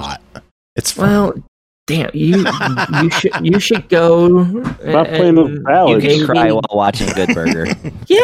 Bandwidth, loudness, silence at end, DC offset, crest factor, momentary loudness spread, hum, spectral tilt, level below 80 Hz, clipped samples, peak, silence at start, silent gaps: 15.5 kHz; -13 LUFS; 0 s; under 0.1%; 12 dB; 10 LU; none; -5.5 dB/octave; -40 dBFS; under 0.1%; 0 dBFS; 0 s; 0.51-0.76 s, 1.48-1.87 s